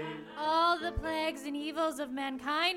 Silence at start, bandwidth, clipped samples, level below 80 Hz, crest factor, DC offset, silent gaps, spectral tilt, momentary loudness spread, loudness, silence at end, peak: 0 s; 17 kHz; under 0.1%; -50 dBFS; 18 dB; under 0.1%; none; -4 dB/octave; 9 LU; -33 LUFS; 0 s; -16 dBFS